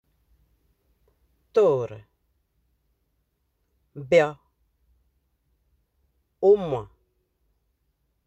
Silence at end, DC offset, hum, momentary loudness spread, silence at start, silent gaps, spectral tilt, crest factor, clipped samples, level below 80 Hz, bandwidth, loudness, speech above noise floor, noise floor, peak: 1.4 s; under 0.1%; none; 13 LU; 1.55 s; none; -6.5 dB/octave; 22 dB; under 0.1%; -62 dBFS; 8.2 kHz; -22 LUFS; 53 dB; -74 dBFS; -6 dBFS